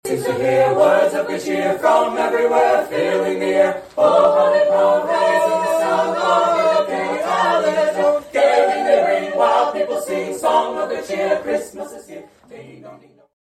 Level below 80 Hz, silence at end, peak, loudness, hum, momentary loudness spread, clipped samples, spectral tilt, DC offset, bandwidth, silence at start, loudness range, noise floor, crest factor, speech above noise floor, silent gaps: -60 dBFS; 0.45 s; -4 dBFS; -17 LUFS; none; 8 LU; under 0.1%; -4.5 dB/octave; under 0.1%; 14 kHz; 0.05 s; 4 LU; -42 dBFS; 14 dB; 26 dB; none